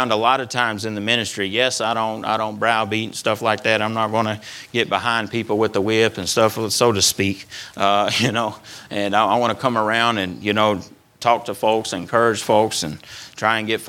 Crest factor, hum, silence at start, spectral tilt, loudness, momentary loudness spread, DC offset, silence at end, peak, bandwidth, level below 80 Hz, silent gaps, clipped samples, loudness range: 20 dB; none; 0 s; -3.5 dB/octave; -19 LUFS; 7 LU; under 0.1%; 0 s; 0 dBFS; 18.5 kHz; -60 dBFS; none; under 0.1%; 2 LU